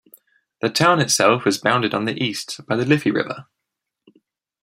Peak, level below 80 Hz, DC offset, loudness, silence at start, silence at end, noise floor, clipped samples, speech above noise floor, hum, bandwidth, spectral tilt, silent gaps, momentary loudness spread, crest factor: -2 dBFS; -62 dBFS; under 0.1%; -19 LUFS; 0.65 s; 1.2 s; -81 dBFS; under 0.1%; 62 dB; none; 16 kHz; -4 dB/octave; none; 11 LU; 20 dB